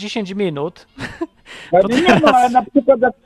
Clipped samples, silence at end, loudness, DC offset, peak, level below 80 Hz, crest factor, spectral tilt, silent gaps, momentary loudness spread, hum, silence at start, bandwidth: under 0.1%; 0.15 s; -14 LUFS; under 0.1%; 0 dBFS; -48 dBFS; 16 dB; -5.5 dB/octave; none; 18 LU; none; 0 s; 13 kHz